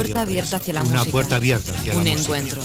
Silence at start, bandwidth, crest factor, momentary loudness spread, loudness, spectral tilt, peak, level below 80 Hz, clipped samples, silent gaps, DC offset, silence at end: 0 s; 17 kHz; 18 dB; 4 LU; -21 LUFS; -4.5 dB/octave; -4 dBFS; -40 dBFS; under 0.1%; none; under 0.1%; 0 s